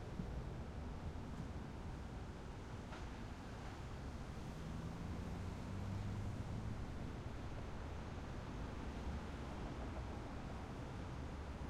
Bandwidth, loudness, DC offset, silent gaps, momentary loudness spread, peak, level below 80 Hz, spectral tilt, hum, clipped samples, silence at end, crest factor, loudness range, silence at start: 13.5 kHz; -49 LUFS; under 0.1%; none; 4 LU; -30 dBFS; -52 dBFS; -6.5 dB/octave; none; under 0.1%; 0 s; 16 dB; 3 LU; 0 s